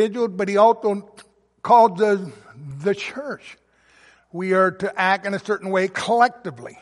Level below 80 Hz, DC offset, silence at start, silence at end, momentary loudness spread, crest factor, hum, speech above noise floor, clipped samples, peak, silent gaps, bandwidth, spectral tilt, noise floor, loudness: -68 dBFS; under 0.1%; 0 s; 0.1 s; 19 LU; 18 dB; none; 35 dB; under 0.1%; -4 dBFS; none; 11.5 kHz; -5.5 dB/octave; -55 dBFS; -20 LUFS